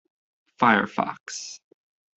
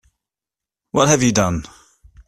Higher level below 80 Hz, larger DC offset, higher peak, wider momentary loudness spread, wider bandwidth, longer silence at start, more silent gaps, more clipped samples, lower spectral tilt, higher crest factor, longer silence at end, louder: second, -72 dBFS vs -44 dBFS; neither; second, -4 dBFS vs 0 dBFS; first, 18 LU vs 10 LU; second, 8.2 kHz vs 14 kHz; second, 0.6 s vs 0.95 s; first, 1.20-1.26 s vs none; neither; about the same, -4 dB/octave vs -4.5 dB/octave; about the same, 24 dB vs 20 dB; about the same, 0.6 s vs 0.6 s; second, -24 LUFS vs -17 LUFS